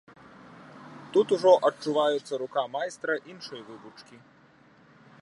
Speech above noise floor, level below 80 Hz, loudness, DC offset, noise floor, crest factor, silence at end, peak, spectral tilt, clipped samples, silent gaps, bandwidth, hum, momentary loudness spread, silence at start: 31 dB; -78 dBFS; -26 LUFS; under 0.1%; -58 dBFS; 22 dB; 1.2 s; -8 dBFS; -4.5 dB/octave; under 0.1%; none; 11 kHz; none; 26 LU; 0.75 s